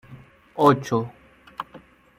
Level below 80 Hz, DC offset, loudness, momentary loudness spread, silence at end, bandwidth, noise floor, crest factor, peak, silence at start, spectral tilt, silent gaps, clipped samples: -62 dBFS; under 0.1%; -21 LUFS; 20 LU; 0.4 s; 16 kHz; -49 dBFS; 22 dB; -4 dBFS; 0.1 s; -7 dB/octave; none; under 0.1%